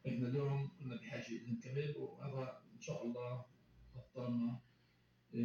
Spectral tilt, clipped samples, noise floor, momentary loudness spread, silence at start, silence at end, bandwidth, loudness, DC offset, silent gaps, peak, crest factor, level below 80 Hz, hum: -7.5 dB/octave; under 0.1%; -73 dBFS; 13 LU; 0.05 s; 0 s; 7 kHz; -44 LUFS; under 0.1%; none; -28 dBFS; 16 dB; -76 dBFS; none